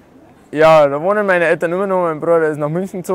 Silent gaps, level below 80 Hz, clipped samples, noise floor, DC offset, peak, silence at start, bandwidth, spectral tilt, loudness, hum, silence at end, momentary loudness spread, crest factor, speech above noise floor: none; -52 dBFS; under 0.1%; -45 dBFS; under 0.1%; -2 dBFS; 0.5 s; 15.5 kHz; -6.5 dB/octave; -14 LUFS; none; 0 s; 10 LU; 12 dB; 31 dB